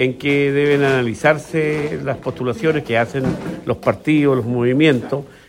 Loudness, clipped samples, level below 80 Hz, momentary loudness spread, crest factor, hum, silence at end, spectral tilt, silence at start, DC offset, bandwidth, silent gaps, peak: -18 LUFS; under 0.1%; -50 dBFS; 8 LU; 16 dB; none; 0.2 s; -7 dB/octave; 0 s; under 0.1%; 16 kHz; none; 0 dBFS